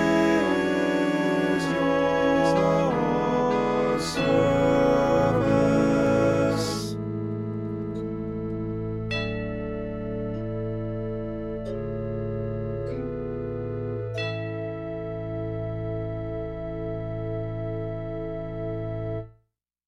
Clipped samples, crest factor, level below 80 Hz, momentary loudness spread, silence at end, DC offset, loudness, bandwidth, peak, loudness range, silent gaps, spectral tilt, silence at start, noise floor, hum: under 0.1%; 16 dB; -44 dBFS; 11 LU; 0.6 s; under 0.1%; -26 LUFS; 14 kHz; -10 dBFS; 10 LU; none; -6.5 dB/octave; 0 s; -72 dBFS; none